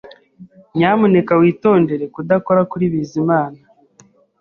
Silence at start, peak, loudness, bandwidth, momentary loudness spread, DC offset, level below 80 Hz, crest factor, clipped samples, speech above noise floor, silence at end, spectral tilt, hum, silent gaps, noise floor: 0.05 s; -2 dBFS; -16 LUFS; 7 kHz; 7 LU; under 0.1%; -56 dBFS; 14 dB; under 0.1%; 37 dB; 0.85 s; -8.5 dB/octave; none; none; -51 dBFS